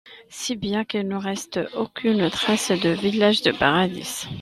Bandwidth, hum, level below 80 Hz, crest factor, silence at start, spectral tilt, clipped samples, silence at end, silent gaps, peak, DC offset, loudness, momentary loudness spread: 14 kHz; none; -54 dBFS; 20 dB; 0.05 s; -4 dB/octave; under 0.1%; 0 s; none; -4 dBFS; under 0.1%; -22 LUFS; 10 LU